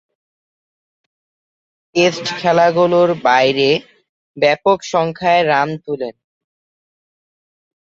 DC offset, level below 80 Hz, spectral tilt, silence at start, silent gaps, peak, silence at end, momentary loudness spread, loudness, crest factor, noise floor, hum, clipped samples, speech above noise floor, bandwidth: under 0.1%; -60 dBFS; -5 dB/octave; 1.95 s; 4.09-4.34 s; -2 dBFS; 1.7 s; 9 LU; -15 LUFS; 16 dB; under -90 dBFS; none; under 0.1%; over 75 dB; 7.8 kHz